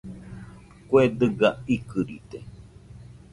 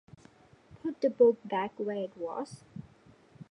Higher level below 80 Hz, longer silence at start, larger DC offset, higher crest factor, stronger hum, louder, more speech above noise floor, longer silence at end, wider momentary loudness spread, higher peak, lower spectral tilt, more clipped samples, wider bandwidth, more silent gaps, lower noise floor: first, -52 dBFS vs -72 dBFS; second, 0.05 s vs 0.85 s; neither; about the same, 20 dB vs 20 dB; neither; first, -23 LUFS vs -31 LUFS; second, 23 dB vs 30 dB; first, 0.35 s vs 0.1 s; about the same, 22 LU vs 22 LU; first, -6 dBFS vs -12 dBFS; about the same, -7.5 dB/octave vs -7 dB/octave; neither; about the same, 11.5 kHz vs 10.5 kHz; neither; second, -46 dBFS vs -60 dBFS